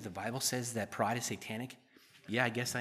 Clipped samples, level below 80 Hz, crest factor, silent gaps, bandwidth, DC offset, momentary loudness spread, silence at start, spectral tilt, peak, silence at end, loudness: under 0.1%; -78 dBFS; 24 dB; none; 15 kHz; under 0.1%; 13 LU; 0 s; -3.5 dB/octave; -14 dBFS; 0 s; -36 LUFS